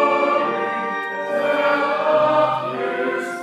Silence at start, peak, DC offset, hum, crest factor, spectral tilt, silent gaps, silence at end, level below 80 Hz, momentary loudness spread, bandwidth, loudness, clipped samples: 0 s; -6 dBFS; under 0.1%; none; 14 dB; -5 dB/octave; none; 0 s; -80 dBFS; 7 LU; 12.5 kHz; -20 LUFS; under 0.1%